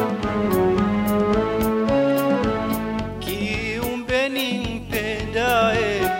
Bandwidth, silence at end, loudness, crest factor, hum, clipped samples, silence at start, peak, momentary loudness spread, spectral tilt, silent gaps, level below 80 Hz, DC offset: 16.5 kHz; 0 s; -21 LUFS; 14 dB; none; under 0.1%; 0 s; -8 dBFS; 7 LU; -5.5 dB/octave; none; -38 dBFS; under 0.1%